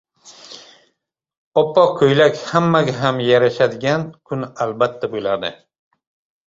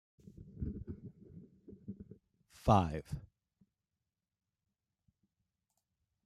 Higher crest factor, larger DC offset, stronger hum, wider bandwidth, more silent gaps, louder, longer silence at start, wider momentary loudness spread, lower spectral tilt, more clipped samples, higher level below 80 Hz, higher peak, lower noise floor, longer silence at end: second, 18 dB vs 28 dB; neither; neither; second, 7.8 kHz vs 13 kHz; first, 1.38-1.52 s vs none; first, -17 LUFS vs -36 LUFS; second, 0.25 s vs 0.4 s; second, 13 LU vs 27 LU; second, -6 dB/octave vs -8 dB/octave; neither; about the same, -58 dBFS vs -56 dBFS; first, -2 dBFS vs -12 dBFS; second, -73 dBFS vs under -90 dBFS; second, 0.95 s vs 3 s